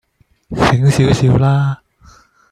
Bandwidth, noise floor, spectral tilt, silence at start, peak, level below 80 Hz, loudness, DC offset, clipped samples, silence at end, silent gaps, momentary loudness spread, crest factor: 11.5 kHz; -46 dBFS; -6.5 dB/octave; 0.5 s; 0 dBFS; -36 dBFS; -13 LUFS; under 0.1%; under 0.1%; 0.75 s; none; 12 LU; 14 dB